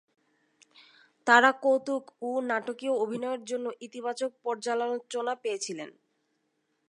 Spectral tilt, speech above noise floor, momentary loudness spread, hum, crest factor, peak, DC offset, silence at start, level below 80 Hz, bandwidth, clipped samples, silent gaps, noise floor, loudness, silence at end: -2.5 dB/octave; 48 dB; 15 LU; none; 24 dB; -6 dBFS; under 0.1%; 1.25 s; -86 dBFS; 11 kHz; under 0.1%; none; -76 dBFS; -29 LUFS; 1 s